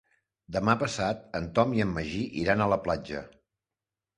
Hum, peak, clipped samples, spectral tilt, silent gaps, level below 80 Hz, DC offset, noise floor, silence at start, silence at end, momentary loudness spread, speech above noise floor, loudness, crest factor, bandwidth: none; -6 dBFS; under 0.1%; -6 dB/octave; none; -52 dBFS; under 0.1%; under -90 dBFS; 0.5 s; 0.9 s; 9 LU; over 62 dB; -28 LUFS; 24 dB; 11 kHz